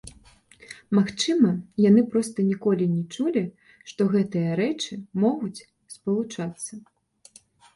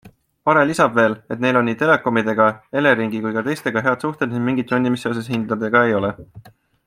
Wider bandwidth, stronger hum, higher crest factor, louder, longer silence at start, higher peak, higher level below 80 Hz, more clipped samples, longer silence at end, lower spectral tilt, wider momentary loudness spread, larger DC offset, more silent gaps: second, 11.5 kHz vs 15 kHz; neither; about the same, 18 dB vs 18 dB; second, -24 LUFS vs -18 LUFS; about the same, 0.05 s vs 0.05 s; second, -8 dBFS vs -2 dBFS; about the same, -62 dBFS vs -58 dBFS; neither; first, 0.95 s vs 0.35 s; about the same, -6 dB/octave vs -6.5 dB/octave; first, 17 LU vs 7 LU; neither; neither